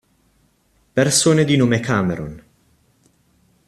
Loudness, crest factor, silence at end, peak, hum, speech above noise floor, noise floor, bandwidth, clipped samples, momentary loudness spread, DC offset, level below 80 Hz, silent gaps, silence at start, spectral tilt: -17 LUFS; 18 dB; 1.3 s; -2 dBFS; none; 44 dB; -61 dBFS; 13.5 kHz; under 0.1%; 12 LU; under 0.1%; -52 dBFS; none; 0.95 s; -4.5 dB/octave